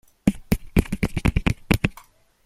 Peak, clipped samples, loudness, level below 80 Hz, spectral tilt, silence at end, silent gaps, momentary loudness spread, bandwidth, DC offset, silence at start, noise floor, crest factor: -2 dBFS; under 0.1%; -24 LUFS; -30 dBFS; -6.5 dB/octave; 0.5 s; none; 4 LU; 16.5 kHz; under 0.1%; 0.25 s; -51 dBFS; 22 dB